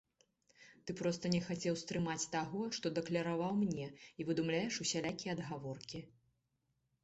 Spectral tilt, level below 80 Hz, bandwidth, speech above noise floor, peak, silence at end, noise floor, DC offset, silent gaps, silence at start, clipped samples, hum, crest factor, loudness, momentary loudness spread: -4.5 dB/octave; -72 dBFS; 8.2 kHz; 44 dB; -20 dBFS; 0.95 s; -83 dBFS; under 0.1%; none; 0.6 s; under 0.1%; none; 20 dB; -39 LUFS; 11 LU